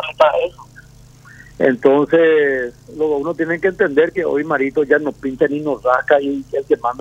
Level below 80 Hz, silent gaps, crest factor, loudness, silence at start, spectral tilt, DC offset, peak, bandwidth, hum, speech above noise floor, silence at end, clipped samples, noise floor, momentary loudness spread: -50 dBFS; none; 16 dB; -16 LUFS; 0 s; -6.5 dB/octave; under 0.1%; 0 dBFS; 8.2 kHz; none; 27 dB; 0 s; under 0.1%; -43 dBFS; 9 LU